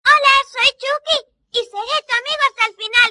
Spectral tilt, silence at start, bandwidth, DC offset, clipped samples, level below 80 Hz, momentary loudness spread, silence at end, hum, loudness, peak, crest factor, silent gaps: 1.5 dB/octave; 0.05 s; 11 kHz; under 0.1%; under 0.1%; -56 dBFS; 11 LU; 0 s; none; -16 LUFS; 0 dBFS; 16 dB; none